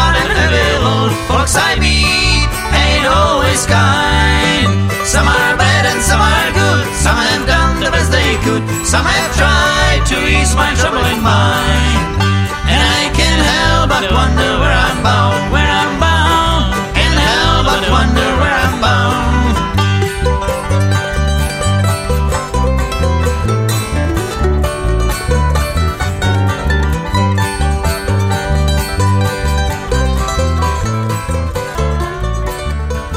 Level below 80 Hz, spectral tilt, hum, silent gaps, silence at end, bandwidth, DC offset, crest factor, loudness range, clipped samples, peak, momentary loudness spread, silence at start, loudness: -18 dBFS; -4.5 dB/octave; none; none; 0 s; 16 kHz; under 0.1%; 12 dB; 4 LU; under 0.1%; 0 dBFS; 6 LU; 0 s; -13 LUFS